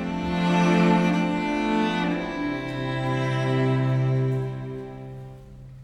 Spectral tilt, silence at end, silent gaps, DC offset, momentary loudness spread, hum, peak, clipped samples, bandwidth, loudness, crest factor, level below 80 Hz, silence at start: -7 dB/octave; 0 s; none; under 0.1%; 18 LU; none; -8 dBFS; under 0.1%; 10 kHz; -24 LUFS; 16 dB; -48 dBFS; 0 s